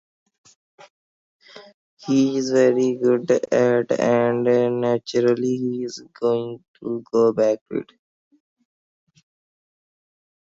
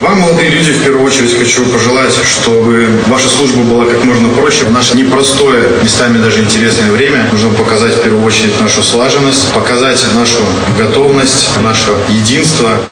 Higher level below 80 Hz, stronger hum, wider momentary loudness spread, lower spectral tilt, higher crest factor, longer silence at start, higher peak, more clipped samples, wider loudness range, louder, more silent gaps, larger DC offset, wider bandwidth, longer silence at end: second, -70 dBFS vs -36 dBFS; neither; first, 12 LU vs 1 LU; first, -6 dB/octave vs -3.5 dB/octave; first, 18 dB vs 8 dB; first, 1.55 s vs 0 s; second, -6 dBFS vs 0 dBFS; second, under 0.1% vs 0.3%; first, 7 LU vs 1 LU; second, -20 LUFS vs -7 LUFS; first, 1.74-1.97 s, 6.68-6.74 s, 7.61-7.66 s vs none; neither; second, 7.8 kHz vs 11.5 kHz; first, 2.7 s vs 0.05 s